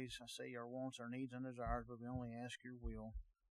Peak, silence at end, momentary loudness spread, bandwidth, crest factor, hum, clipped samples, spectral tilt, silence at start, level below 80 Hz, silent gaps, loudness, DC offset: -28 dBFS; 0.25 s; 6 LU; 13.5 kHz; 22 dB; none; under 0.1%; -5.5 dB/octave; 0 s; -58 dBFS; none; -49 LUFS; under 0.1%